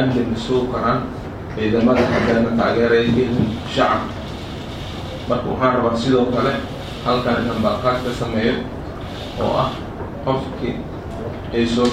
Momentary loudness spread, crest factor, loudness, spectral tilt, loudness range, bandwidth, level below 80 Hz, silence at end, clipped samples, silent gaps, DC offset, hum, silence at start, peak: 13 LU; 16 dB; -20 LUFS; -6.5 dB/octave; 5 LU; 13 kHz; -36 dBFS; 0 s; under 0.1%; none; under 0.1%; none; 0 s; -2 dBFS